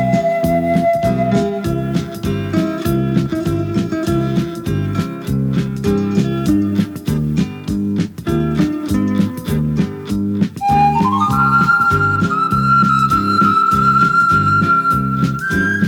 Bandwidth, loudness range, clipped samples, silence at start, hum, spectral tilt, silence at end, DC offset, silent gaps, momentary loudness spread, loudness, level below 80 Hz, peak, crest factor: 19.5 kHz; 6 LU; under 0.1%; 0 s; none; -7 dB/octave; 0 s; under 0.1%; none; 8 LU; -15 LUFS; -36 dBFS; -2 dBFS; 14 dB